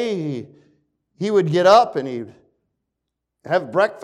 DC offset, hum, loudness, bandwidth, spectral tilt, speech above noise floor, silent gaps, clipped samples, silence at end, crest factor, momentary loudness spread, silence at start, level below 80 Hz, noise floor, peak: under 0.1%; none; -18 LUFS; 12 kHz; -6 dB/octave; 62 dB; none; under 0.1%; 0 s; 18 dB; 18 LU; 0 s; -68 dBFS; -80 dBFS; -2 dBFS